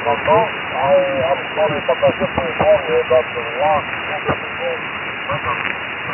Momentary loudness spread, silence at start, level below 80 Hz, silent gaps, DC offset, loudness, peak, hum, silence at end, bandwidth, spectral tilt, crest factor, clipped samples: 7 LU; 0 s; -44 dBFS; none; under 0.1%; -18 LUFS; -2 dBFS; none; 0 s; 3.2 kHz; -8.5 dB/octave; 16 dB; under 0.1%